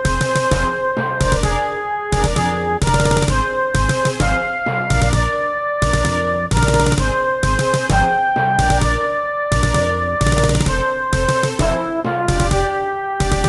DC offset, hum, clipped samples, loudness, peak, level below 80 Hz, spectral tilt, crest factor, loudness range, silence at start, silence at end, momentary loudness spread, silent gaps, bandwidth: under 0.1%; none; under 0.1%; -17 LUFS; -2 dBFS; -24 dBFS; -5 dB/octave; 14 dB; 1 LU; 0 s; 0 s; 4 LU; none; 12.5 kHz